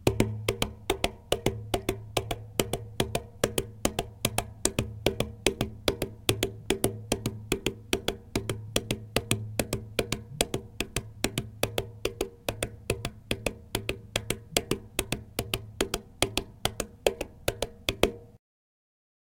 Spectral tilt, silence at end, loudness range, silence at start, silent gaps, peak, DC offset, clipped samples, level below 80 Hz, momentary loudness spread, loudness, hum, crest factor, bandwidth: -3.5 dB/octave; 0.95 s; 3 LU; 0 s; none; 0 dBFS; under 0.1%; under 0.1%; -44 dBFS; 5 LU; -31 LUFS; none; 32 dB; 17 kHz